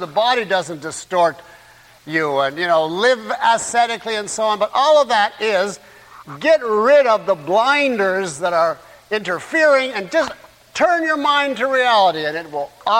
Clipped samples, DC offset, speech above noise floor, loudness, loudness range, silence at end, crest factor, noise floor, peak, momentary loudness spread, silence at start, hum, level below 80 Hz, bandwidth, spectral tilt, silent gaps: under 0.1%; under 0.1%; 29 dB; -17 LUFS; 2 LU; 0 s; 14 dB; -46 dBFS; -4 dBFS; 10 LU; 0 s; none; -62 dBFS; 16 kHz; -3 dB/octave; none